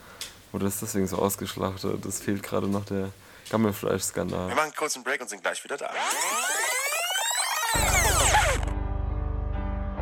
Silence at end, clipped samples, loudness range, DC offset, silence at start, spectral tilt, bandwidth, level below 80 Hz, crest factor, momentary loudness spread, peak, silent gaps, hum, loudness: 0 s; under 0.1%; 5 LU; under 0.1%; 0 s; -3 dB/octave; 19.5 kHz; -36 dBFS; 20 dB; 11 LU; -8 dBFS; none; none; -27 LUFS